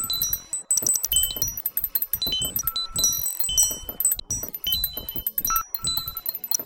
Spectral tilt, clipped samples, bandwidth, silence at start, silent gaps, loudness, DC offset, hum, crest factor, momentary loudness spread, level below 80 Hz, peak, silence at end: 0 dB/octave; under 0.1%; 18 kHz; 0 s; none; -23 LUFS; under 0.1%; none; 20 dB; 7 LU; -44 dBFS; -6 dBFS; 0 s